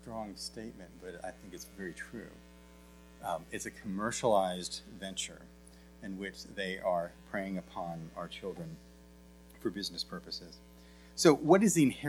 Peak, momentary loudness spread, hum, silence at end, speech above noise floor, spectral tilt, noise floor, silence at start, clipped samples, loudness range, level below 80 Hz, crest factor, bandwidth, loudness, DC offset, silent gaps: -10 dBFS; 21 LU; none; 0 s; 22 dB; -4.5 dB/octave; -56 dBFS; 0 s; under 0.1%; 10 LU; -60 dBFS; 26 dB; 19.5 kHz; -34 LUFS; under 0.1%; none